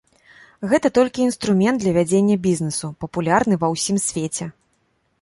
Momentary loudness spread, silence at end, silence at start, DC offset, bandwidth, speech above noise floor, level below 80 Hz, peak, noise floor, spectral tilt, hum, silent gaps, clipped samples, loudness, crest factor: 9 LU; 0.7 s; 0.6 s; under 0.1%; 11.5 kHz; 47 dB; -54 dBFS; -2 dBFS; -66 dBFS; -5 dB/octave; none; none; under 0.1%; -19 LUFS; 18 dB